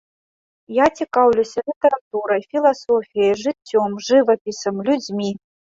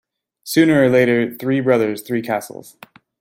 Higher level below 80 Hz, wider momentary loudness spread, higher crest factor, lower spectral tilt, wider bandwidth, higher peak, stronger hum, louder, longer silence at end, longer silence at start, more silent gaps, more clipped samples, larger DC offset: about the same, -60 dBFS vs -62 dBFS; second, 9 LU vs 17 LU; about the same, 16 dB vs 16 dB; about the same, -5 dB/octave vs -6 dB/octave; second, 7.8 kHz vs 16.5 kHz; about the same, -2 dBFS vs -2 dBFS; neither; about the same, -19 LUFS vs -17 LUFS; second, 0.35 s vs 0.5 s; first, 0.7 s vs 0.45 s; first, 1.76-1.81 s, 2.01-2.11 s, 4.41-4.45 s vs none; neither; neither